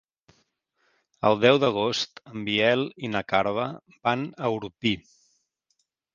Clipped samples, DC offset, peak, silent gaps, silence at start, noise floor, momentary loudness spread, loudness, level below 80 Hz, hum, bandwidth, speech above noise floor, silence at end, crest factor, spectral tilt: under 0.1%; under 0.1%; -4 dBFS; none; 1.25 s; -75 dBFS; 11 LU; -25 LUFS; -62 dBFS; none; 7.4 kHz; 50 dB; 1.15 s; 24 dB; -5 dB/octave